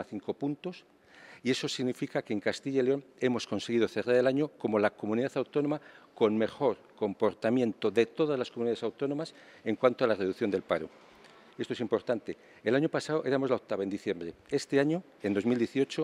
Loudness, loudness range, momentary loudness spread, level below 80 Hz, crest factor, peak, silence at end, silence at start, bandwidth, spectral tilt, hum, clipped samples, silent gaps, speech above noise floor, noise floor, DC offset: -31 LUFS; 3 LU; 8 LU; -76 dBFS; 22 dB; -10 dBFS; 0 s; 0 s; 12.5 kHz; -6 dB/octave; none; under 0.1%; none; 26 dB; -56 dBFS; under 0.1%